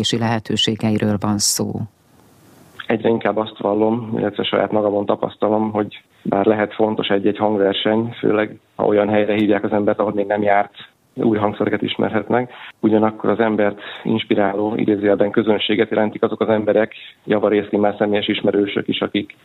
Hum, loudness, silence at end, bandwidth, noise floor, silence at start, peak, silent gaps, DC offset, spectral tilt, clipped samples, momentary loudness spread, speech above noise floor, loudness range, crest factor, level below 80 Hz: none; -18 LUFS; 0.2 s; 15.5 kHz; -51 dBFS; 0 s; 0 dBFS; none; under 0.1%; -5 dB/octave; under 0.1%; 6 LU; 33 dB; 2 LU; 18 dB; -58 dBFS